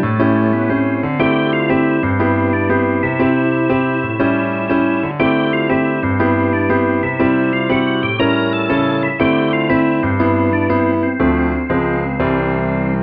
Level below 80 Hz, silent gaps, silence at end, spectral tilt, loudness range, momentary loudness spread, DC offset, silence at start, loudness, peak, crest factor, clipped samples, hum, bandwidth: -36 dBFS; none; 0 s; -10.5 dB/octave; 1 LU; 2 LU; under 0.1%; 0 s; -16 LUFS; -2 dBFS; 14 dB; under 0.1%; none; 5 kHz